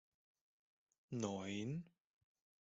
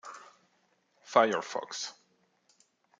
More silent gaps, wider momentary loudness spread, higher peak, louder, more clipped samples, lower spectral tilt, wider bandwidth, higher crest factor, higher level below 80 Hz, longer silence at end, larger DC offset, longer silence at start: neither; second, 7 LU vs 21 LU; second, -28 dBFS vs -8 dBFS; second, -46 LUFS vs -30 LUFS; neither; first, -6 dB/octave vs -2.5 dB/octave; second, 8 kHz vs 9.4 kHz; about the same, 22 dB vs 26 dB; first, -82 dBFS vs -88 dBFS; second, 0.75 s vs 1.1 s; neither; first, 1.1 s vs 0.05 s